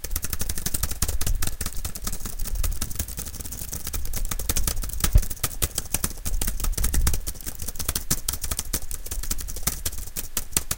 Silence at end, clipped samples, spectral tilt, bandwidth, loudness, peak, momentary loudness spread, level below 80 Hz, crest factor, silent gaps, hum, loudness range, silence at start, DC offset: 0 s; under 0.1%; -2.5 dB/octave; 17.5 kHz; -28 LUFS; -2 dBFS; 7 LU; -28 dBFS; 22 dB; none; none; 4 LU; 0 s; under 0.1%